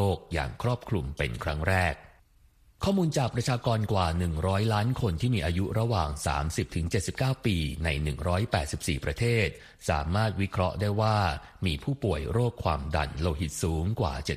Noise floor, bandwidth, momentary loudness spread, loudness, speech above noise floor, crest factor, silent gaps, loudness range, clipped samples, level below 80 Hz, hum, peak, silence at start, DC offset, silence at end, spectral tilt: -60 dBFS; 15 kHz; 5 LU; -29 LUFS; 32 dB; 18 dB; none; 2 LU; under 0.1%; -40 dBFS; none; -10 dBFS; 0 s; under 0.1%; 0 s; -6 dB/octave